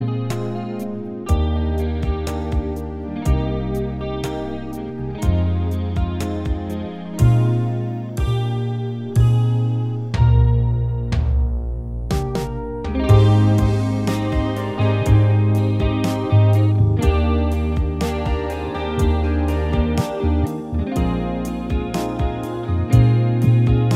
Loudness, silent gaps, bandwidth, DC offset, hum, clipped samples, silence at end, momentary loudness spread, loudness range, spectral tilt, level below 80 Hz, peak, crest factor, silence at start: -20 LUFS; none; 13.5 kHz; under 0.1%; none; under 0.1%; 0 s; 11 LU; 6 LU; -8 dB/octave; -26 dBFS; -2 dBFS; 16 dB; 0 s